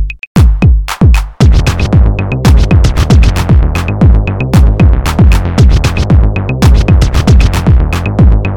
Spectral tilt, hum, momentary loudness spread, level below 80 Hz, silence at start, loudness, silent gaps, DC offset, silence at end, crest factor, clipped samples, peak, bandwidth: -7 dB/octave; none; 3 LU; -8 dBFS; 0 s; -9 LUFS; 0.27-0.35 s; 0.7%; 0 s; 6 dB; under 0.1%; 0 dBFS; 15 kHz